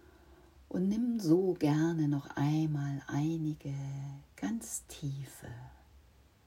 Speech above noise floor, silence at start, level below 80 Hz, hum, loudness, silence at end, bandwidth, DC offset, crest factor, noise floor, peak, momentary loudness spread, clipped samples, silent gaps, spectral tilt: 29 dB; 0.3 s; -62 dBFS; none; -34 LUFS; 0.5 s; 16 kHz; under 0.1%; 18 dB; -62 dBFS; -16 dBFS; 15 LU; under 0.1%; none; -7 dB/octave